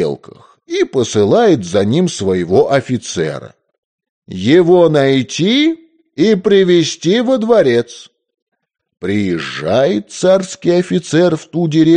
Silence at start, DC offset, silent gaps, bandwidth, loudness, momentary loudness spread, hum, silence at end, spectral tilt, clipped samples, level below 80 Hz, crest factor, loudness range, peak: 0 s; under 0.1%; 3.78-3.99 s, 4.09-4.22 s, 8.42-8.47 s; 10 kHz; -13 LUFS; 10 LU; none; 0 s; -5.5 dB/octave; under 0.1%; -56 dBFS; 12 dB; 4 LU; 0 dBFS